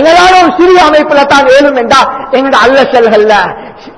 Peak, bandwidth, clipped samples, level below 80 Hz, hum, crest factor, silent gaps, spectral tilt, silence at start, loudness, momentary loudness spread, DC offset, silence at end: 0 dBFS; 11 kHz; 7%; -36 dBFS; none; 6 dB; none; -3.5 dB/octave; 0 s; -5 LUFS; 6 LU; 0.5%; 0.05 s